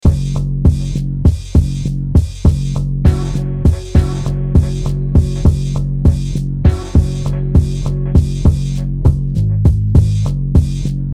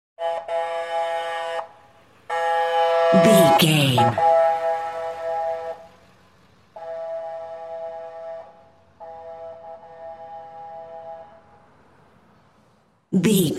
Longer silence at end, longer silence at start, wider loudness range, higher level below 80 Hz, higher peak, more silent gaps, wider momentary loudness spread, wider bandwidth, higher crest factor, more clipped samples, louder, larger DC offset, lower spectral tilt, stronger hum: about the same, 0 s vs 0 s; second, 0.05 s vs 0.2 s; second, 1 LU vs 22 LU; first, -18 dBFS vs -66 dBFS; first, 0 dBFS vs -4 dBFS; neither; second, 6 LU vs 24 LU; second, 10.5 kHz vs 16 kHz; second, 14 dB vs 20 dB; first, 0.2% vs under 0.1%; first, -15 LUFS vs -21 LUFS; neither; first, -8.5 dB/octave vs -5 dB/octave; neither